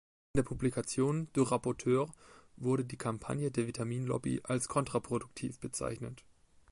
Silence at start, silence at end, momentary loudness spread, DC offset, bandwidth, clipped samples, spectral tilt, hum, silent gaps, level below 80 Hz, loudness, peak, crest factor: 0.35 s; 0.5 s; 8 LU; under 0.1%; 11.5 kHz; under 0.1%; -6 dB/octave; none; none; -58 dBFS; -35 LUFS; -16 dBFS; 20 dB